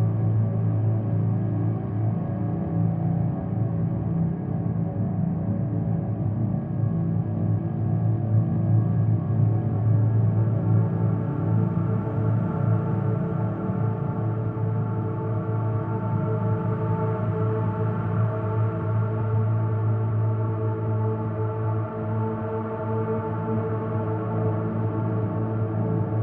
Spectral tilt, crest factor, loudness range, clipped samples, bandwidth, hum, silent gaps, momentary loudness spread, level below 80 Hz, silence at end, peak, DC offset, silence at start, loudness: -13 dB/octave; 14 dB; 4 LU; under 0.1%; 2.8 kHz; none; none; 5 LU; -48 dBFS; 0 s; -10 dBFS; under 0.1%; 0 s; -25 LUFS